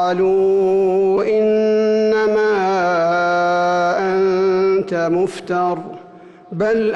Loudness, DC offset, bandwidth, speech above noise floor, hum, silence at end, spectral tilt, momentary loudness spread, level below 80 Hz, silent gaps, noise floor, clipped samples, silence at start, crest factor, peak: -16 LUFS; under 0.1%; 9.2 kHz; 25 dB; none; 0 s; -6.5 dB/octave; 5 LU; -56 dBFS; none; -41 dBFS; under 0.1%; 0 s; 8 dB; -10 dBFS